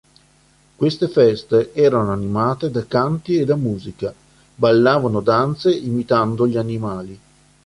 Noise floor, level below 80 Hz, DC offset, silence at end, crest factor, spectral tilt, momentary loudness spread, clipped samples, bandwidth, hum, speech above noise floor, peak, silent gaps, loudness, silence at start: -55 dBFS; -50 dBFS; under 0.1%; 0.5 s; 16 dB; -7.5 dB/octave; 11 LU; under 0.1%; 11.5 kHz; none; 37 dB; -2 dBFS; none; -18 LUFS; 0.8 s